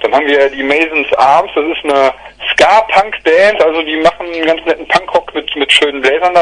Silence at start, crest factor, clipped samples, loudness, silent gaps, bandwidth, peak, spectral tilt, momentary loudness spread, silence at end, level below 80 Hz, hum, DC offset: 0 s; 10 dB; 0.4%; -11 LUFS; none; 12 kHz; 0 dBFS; -2.5 dB/octave; 7 LU; 0 s; -44 dBFS; none; under 0.1%